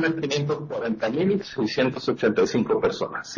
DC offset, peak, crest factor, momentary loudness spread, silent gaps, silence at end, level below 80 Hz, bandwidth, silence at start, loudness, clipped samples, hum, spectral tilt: under 0.1%; -8 dBFS; 16 dB; 6 LU; none; 0 s; -58 dBFS; 7.4 kHz; 0 s; -24 LUFS; under 0.1%; none; -5.5 dB/octave